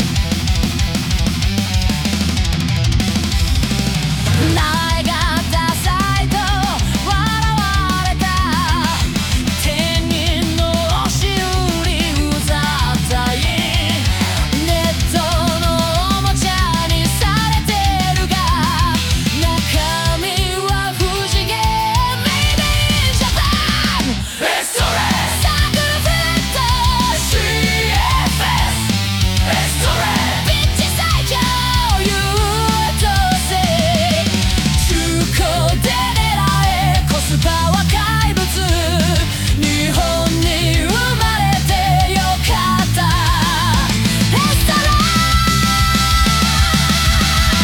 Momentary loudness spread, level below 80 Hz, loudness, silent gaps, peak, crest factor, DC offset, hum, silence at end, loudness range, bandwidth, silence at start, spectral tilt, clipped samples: 4 LU; -22 dBFS; -15 LUFS; none; 0 dBFS; 14 dB; under 0.1%; none; 0 s; 2 LU; 18 kHz; 0 s; -4 dB/octave; under 0.1%